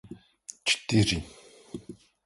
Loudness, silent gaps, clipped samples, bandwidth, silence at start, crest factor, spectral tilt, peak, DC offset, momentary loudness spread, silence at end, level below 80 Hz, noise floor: -26 LUFS; none; under 0.1%; 11.5 kHz; 0.05 s; 20 dB; -4 dB/octave; -10 dBFS; under 0.1%; 23 LU; 0.3 s; -50 dBFS; -50 dBFS